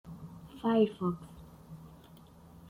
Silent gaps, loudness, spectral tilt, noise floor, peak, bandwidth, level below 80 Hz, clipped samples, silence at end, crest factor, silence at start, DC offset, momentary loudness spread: none; -32 LUFS; -8 dB/octave; -55 dBFS; -16 dBFS; 16 kHz; -62 dBFS; under 0.1%; 0.55 s; 20 dB; 0.05 s; under 0.1%; 25 LU